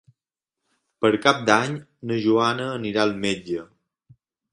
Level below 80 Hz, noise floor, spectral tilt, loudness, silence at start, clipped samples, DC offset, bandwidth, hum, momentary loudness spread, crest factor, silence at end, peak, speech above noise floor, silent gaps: -62 dBFS; -87 dBFS; -5 dB/octave; -22 LUFS; 1 s; under 0.1%; under 0.1%; 11.5 kHz; none; 11 LU; 24 dB; 0.9 s; 0 dBFS; 65 dB; none